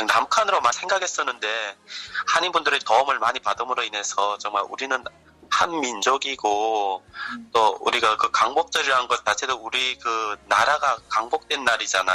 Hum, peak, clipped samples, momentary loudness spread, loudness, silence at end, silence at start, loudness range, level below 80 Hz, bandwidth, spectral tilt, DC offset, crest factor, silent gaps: none; -6 dBFS; under 0.1%; 7 LU; -22 LUFS; 0 s; 0 s; 3 LU; -62 dBFS; 14 kHz; -0.5 dB/octave; under 0.1%; 16 dB; none